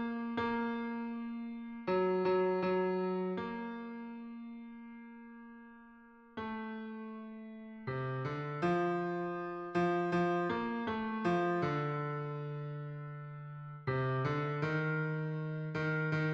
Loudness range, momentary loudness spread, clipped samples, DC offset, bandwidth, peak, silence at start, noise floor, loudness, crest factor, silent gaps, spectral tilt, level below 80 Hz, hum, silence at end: 12 LU; 16 LU; under 0.1%; under 0.1%; 7.4 kHz; -22 dBFS; 0 s; -58 dBFS; -36 LUFS; 16 dB; none; -8.5 dB/octave; -70 dBFS; none; 0 s